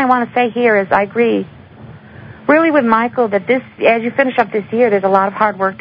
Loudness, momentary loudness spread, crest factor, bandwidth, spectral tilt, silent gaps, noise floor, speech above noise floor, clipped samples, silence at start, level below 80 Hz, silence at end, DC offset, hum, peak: -14 LUFS; 5 LU; 14 dB; 5.2 kHz; -8.5 dB/octave; none; -36 dBFS; 23 dB; under 0.1%; 0 s; -54 dBFS; 0.05 s; under 0.1%; none; 0 dBFS